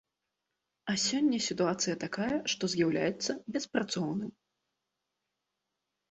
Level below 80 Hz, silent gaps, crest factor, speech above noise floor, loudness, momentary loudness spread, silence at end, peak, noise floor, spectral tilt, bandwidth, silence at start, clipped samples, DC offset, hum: -70 dBFS; none; 20 dB; 54 dB; -32 LUFS; 7 LU; 1.8 s; -14 dBFS; -86 dBFS; -3.5 dB/octave; 8.4 kHz; 0.85 s; under 0.1%; under 0.1%; none